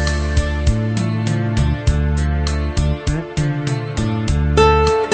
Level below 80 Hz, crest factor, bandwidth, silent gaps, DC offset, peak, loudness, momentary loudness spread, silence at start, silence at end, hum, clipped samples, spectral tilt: -22 dBFS; 16 dB; 9 kHz; none; under 0.1%; 0 dBFS; -18 LUFS; 8 LU; 0 s; 0 s; none; under 0.1%; -6 dB/octave